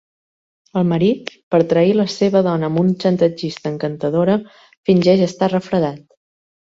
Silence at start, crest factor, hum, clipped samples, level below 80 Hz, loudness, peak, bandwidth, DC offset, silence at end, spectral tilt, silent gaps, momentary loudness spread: 0.75 s; 16 dB; none; under 0.1%; -58 dBFS; -17 LUFS; -2 dBFS; 7.8 kHz; under 0.1%; 0.75 s; -7.5 dB/octave; 1.43-1.51 s, 4.77-4.84 s; 9 LU